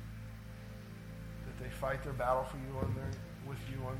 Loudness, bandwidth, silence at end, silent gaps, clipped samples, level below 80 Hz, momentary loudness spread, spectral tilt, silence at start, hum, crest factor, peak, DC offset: -41 LUFS; 17 kHz; 0 s; none; under 0.1%; -50 dBFS; 15 LU; -7 dB/octave; 0 s; none; 20 dB; -20 dBFS; under 0.1%